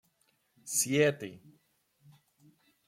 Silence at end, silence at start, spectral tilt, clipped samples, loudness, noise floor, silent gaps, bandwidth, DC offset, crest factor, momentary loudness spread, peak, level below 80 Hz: 1.5 s; 0.65 s; -3.5 dB/octave; under 0.1%; -29 LUFS; -74 dBFS; none; 16.5 kHz; under 0.1%; 20 dB; 20 LU; -14 dBFS; -76 dBFS